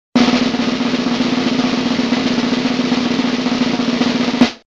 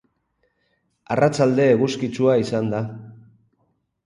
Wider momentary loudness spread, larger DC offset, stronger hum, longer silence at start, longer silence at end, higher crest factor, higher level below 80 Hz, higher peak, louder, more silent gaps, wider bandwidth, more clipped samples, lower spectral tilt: second, 3 LU vs 11 LU; neither; neither; second, 0.15 s vs 1.1 s; second, 0.1 s vs 0.9 s; about the same, 16 dB vs 18 dB; first, -48 dBFS vs -60 dBFS; first, 0 dBFS vs -4 dBFS; first, -16 LUFS vs -20 LUFS; neither; second, 7.8 kHz vs 11.5 kHz; neither; second, -4.5 dB/octave vs -6.5 dB/octave